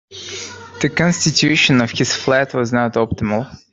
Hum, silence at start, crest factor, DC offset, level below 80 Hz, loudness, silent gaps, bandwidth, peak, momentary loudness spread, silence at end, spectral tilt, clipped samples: none; 0.1 s; 16 dB; under 0.1%; -48 dBFS; -16 LUFS; none; 8.4 kHz; 0 dBFS; 15 LU; 0.15 s; -4 dB/octave; under 0.1%